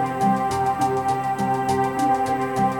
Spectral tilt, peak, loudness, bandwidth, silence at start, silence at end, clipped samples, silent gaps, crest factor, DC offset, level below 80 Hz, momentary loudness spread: -6 dB/octave; -8 dBFS; -22 LUFS; 17 kHz; 0 s; 0 s; under 0.1%; none; 12 dB; under 0.1%; -50 dBFS; 2 LU